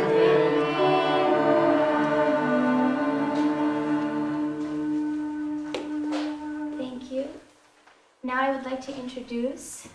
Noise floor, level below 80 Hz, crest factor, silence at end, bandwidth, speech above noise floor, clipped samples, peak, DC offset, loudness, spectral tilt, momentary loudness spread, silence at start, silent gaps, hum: -58 dBFS; -64 dBFS; 16 dB; 0.05 s; 11 kHz; 28 dB; under 0.1%; -10 dBFS; under 0.1%; -25 LUFS; -5.5 dB/octave; 12 LU; 0 s; none; none